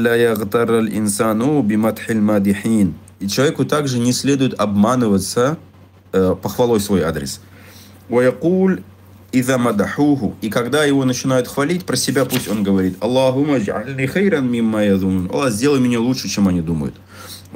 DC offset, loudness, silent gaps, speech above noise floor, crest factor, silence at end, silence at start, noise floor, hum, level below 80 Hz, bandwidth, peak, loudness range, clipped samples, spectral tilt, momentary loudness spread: under 0.1%; -17 LUFS; none; 25 dB; 12 dB; 0 s; 0 s; -41 dBFS; none; -48 dBFS; 16.5 kHz; -4 dBFS; 2 LU; under 0.1%; -5.5 dB/octave; 6 LU